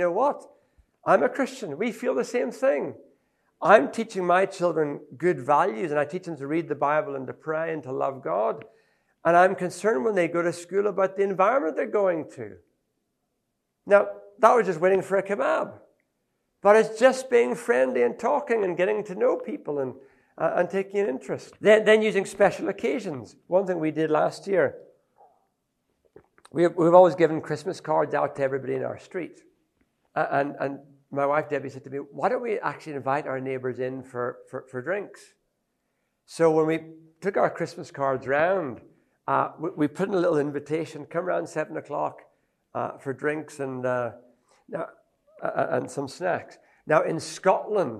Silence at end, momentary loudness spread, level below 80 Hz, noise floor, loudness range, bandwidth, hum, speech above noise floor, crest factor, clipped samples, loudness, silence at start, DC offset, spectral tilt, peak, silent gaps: 0 s; 14 LU; -74 dBFS; -78 dBFS; 7 LU; 12.5 kHz; none; 54 dB; 24 dB; under 0.1%; -25 LUFS; 0 s; under 0.1%; -6 dB/octave; -2 dBFS; none